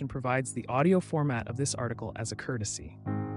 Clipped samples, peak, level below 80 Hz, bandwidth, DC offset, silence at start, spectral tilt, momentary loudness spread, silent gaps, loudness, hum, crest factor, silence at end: under 0.1%; -14 dBFS; -58 dBFS; 11.5 kHz; under 0.1%; 0 s; -5.5 dB/octave; 10 LU; none; -31 LUFS; none; 16 dB; 0 s